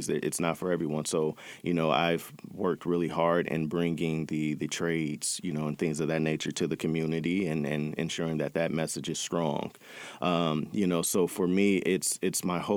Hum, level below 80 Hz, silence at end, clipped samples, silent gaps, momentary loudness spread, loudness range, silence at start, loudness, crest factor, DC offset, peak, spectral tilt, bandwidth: none; -66 dBFS; 0 s; under 0.1%; none; 6 LU; 2 LU; 0 s; -30 LUFS; 18 dB; under 0.1%; -10 dBFS; -5 dB/octave; over 20 kHz